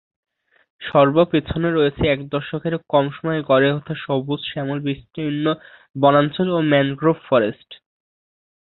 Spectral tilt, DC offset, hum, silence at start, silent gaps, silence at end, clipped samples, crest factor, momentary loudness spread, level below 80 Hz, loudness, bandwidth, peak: -11 dB/octave; under 0.1%; none; 0.8 s; 5.90-5.94 s; 0.9 s; under 0.1%; 18 dB; 10 LU; -46 dBFS; -19 LUFS; 4.2 kHz; -2 dBFS